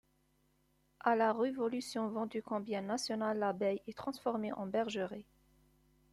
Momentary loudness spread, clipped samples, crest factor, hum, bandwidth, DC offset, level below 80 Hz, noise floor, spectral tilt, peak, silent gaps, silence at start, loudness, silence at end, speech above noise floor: 8 LU; under 0.1%; 20 dB; none; 13.5 kHz; under 0.1%; -74 dBFS; -75 dBFS; -5 dB/octave; -18 dBFS; none; 1.05 s; -37 LUFS; 0.9 s; 38 dB